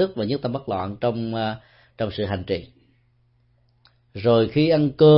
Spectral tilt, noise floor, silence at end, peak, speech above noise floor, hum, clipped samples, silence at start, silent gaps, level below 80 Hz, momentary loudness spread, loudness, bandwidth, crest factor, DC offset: -12 dB/octave; -62 dBFS; 0 s; -4 dBFS; 42 dB; none; under 0.1%; 0 s; none; -54 dBFS; 11 LU; -23 LUFS; 5.8 kHz; 18 dB; under 0.1%